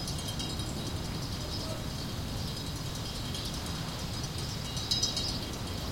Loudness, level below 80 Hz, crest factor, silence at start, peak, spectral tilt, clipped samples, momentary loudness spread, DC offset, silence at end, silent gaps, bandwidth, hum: -34 LUFS; -44 dBFS; 22 dB; 0 s; -14 dBFS; -3.5 dB/octave; under 0.1%; 7 LU; under 0.1%; 0 s; none; 17 kHz; none